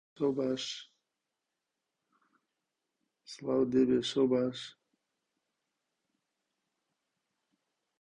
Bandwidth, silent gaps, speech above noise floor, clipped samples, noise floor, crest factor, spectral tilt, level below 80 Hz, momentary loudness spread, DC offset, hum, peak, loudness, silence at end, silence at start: 9.8 kHz; none; 57 dB; under 0.1%; -87 dBFS; 20 dB; -5.5 dB/octave; -72 dBFS; 16 LU; under 0.1%; none; -16 dBFS; -31 LUFS; 3.3 s; 0.2 s